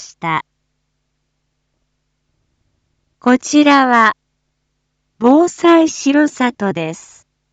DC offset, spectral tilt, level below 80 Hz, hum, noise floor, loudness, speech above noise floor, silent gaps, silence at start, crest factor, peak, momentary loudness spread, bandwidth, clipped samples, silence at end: under 0.1%; -4 dB/octave; -64 dBFS; none; -69 dBFS; -13 LUFS; 57 dB; none; 0 s; 16 dB; 0 dBFS; 12 LU; 8.8 kHz; under 0.1%; 0.55 s